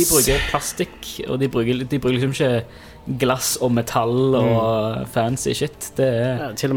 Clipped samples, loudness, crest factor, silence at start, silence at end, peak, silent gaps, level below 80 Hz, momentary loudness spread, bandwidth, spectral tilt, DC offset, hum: under 0.1%; -20 LUFS; 18 dB; 0 s; 0 s; -2 dBFS; none; -38 dBFS; 9 LU; 18 kHz; -4.5 dB/octave; under 0.1%; none